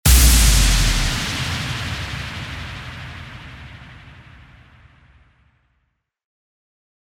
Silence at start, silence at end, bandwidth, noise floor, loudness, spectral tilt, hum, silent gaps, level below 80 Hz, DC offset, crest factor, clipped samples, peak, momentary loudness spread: 0.05 s; 3.05 s; 17 kHz; -70 dBFS; -18 LUFS; -2.5 dB/octave; none; none; -22 dBFS; under 0.1%; 20 dB; under 0.1%; -2 dBFS; 25 LU